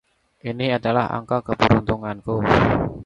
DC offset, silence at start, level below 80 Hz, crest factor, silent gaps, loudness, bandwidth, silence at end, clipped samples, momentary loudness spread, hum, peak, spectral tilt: under 0.1%; 0.45 s; -38 dBFS; 20 dB; none; -20 LUFS; 7.8 kHz; 0 s; under 0.1%; 9 LU; none; 0 dBFS; -7.5 dB/octave